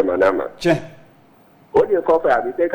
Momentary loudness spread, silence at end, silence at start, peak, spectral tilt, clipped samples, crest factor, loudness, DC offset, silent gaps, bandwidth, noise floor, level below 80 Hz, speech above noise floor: 4 LU; 0 s; 0 s; -6 dBFS; -6.5 dB/octave; under 0.1%; 14 dB; -18 LUFS; under 0.1%; none; 19 kHz; -51 dBFS; -50 dBFS; 33 dB